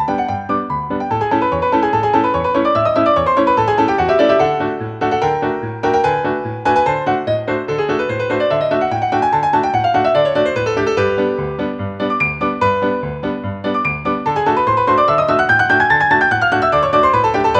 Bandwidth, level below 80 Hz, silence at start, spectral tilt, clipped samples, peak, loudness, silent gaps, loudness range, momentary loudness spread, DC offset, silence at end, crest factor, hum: 9 kHz; -42 dBFS; 0 s; -6.5 dB/octave; under 0.1%; -2 dBFS; -16 LUFS; none; 4 LU; 7 LU; under 0.1%; 0 s; 14 dB; none